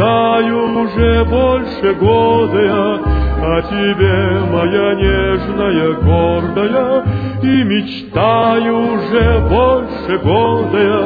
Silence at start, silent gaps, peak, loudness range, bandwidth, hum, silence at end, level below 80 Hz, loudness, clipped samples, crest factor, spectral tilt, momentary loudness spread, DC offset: 0 s; none; 0 dBFS; 1 LU; 5 kHz; none; 0 s; -24 dBFS; -13 LUFS; under 0.1%; 12 dB; -10 dB/octave; 4 LU; under 0.1%